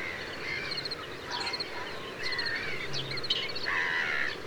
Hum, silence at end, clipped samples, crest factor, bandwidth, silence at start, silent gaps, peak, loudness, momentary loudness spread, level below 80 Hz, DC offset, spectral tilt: none; 0 s; under 0.1%; 18 dB; over 20 kHz; 0 s; none; -14 dBFS; -32 LUFS; 8 LU; -60 dBFS; under 0.1%; -2.5 dB/octave